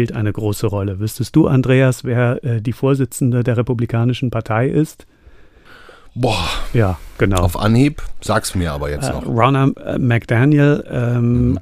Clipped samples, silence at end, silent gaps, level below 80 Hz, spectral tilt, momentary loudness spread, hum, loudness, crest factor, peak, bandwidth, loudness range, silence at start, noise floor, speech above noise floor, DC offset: under 0.1%; 0 s; none; -32 dBFS; -6.5 dB/octave; 7 LU; none; -17 LUFS; 16 dB; 0 dBFS; 15.5 kHz; 4 LU; 0 s; -43 dBFS; 28 dB; under 0.1%